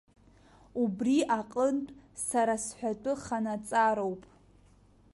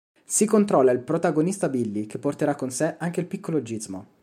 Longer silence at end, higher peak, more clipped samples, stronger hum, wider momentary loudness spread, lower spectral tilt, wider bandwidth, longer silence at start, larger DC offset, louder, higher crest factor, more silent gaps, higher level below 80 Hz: first, 0.9 s vs 0.2 s; second, -14 dBFS vs -6 dBFS; neither; neither; about the same, 10 LU vs 10 LU; about the same, -4.5 dB/octave vs -5.5 dB/octave; second, 11.5 kHz vs 15.5 kHz; first, 0.75 s vs 0.3 s; neither; second, -31 LUFS vs -24 LUFS; about the same, 18 dB vs 18 dB; neither; first, -64 dBFS vs -70 dBFS